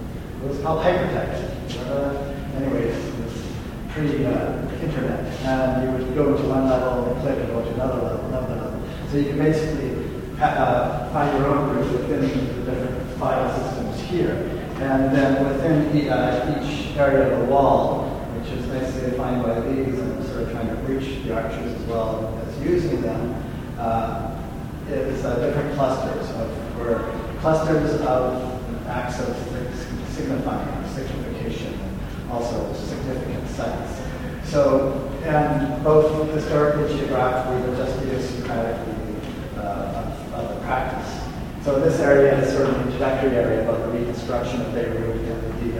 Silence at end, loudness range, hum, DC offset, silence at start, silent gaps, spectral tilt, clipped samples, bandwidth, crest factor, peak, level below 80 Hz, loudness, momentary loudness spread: 0 s; 7 LU; none; under 0.1%; 0 s; none; -7 dB/octave; under 0.1%; 16.5 kHz; 20 dB; -2 dBFS; -36 dBFS; -23 LUFS; 10 LU